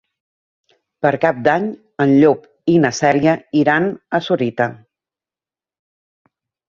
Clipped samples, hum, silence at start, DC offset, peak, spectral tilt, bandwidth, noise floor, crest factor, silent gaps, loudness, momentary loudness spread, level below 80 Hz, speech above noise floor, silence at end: under 0.1%; none; 1.05 s; under 0.1%; 0 dBFS; -6 dB/octave; 7.4 kHz; under -90 dBFS; 18 dB; none; -16 LUFS; 8 LU; -58 dBFS; over 75 dB; 1.95 s